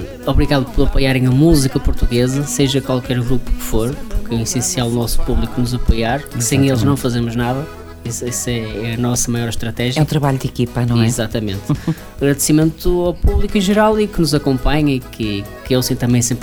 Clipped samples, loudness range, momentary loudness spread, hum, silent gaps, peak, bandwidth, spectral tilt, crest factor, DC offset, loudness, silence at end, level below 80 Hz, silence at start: under 0.1%; 3 LU; 8 LU; none; none; 0 dBFS; 19 kHz; -5 dB/octave; 16 dB; under 0.1%; -17 LUFS; 0 s; -22 dBFS; 0 s